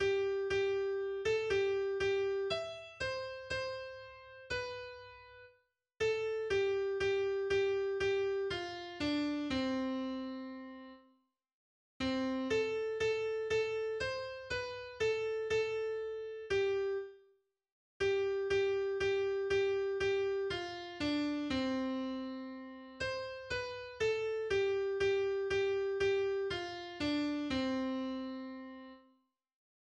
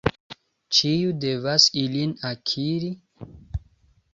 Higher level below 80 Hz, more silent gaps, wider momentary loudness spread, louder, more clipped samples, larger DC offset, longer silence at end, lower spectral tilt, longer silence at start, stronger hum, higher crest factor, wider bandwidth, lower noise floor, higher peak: second, -62 dBFS vs -46 dBFS; first, 11.53-12.00 s, 17.72-18.00 s vs 0.20-0.30 s; second, 12 LU vs 19 LU; second, -36 LUFS vs -22 LUFS; neither; neither; first, 1 s vs 0.55 s; about the same, -4.5 dB/octave vs -4 dB/octave; about the same, 0 s vs 0.05 s; neither; second, 14 dB vs 24 dB; first, 9.2 kHz vs 7.8 kHz; first, -74 dBFS vs -60 dBFS; second, -22 dBFS vs -2 dBFS